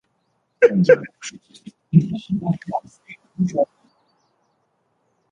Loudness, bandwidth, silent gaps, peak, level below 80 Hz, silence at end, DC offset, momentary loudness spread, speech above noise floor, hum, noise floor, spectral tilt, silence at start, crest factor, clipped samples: -20 LUFS; 9.4 kHz; none; -2 dBFS; -60 dBFS; 1.65 s; under 0.1%; 19 LU; 50 dB; none; -69 dBFS; -7.5 dB/octave; 0.6 s; 20 dB; under 0.1%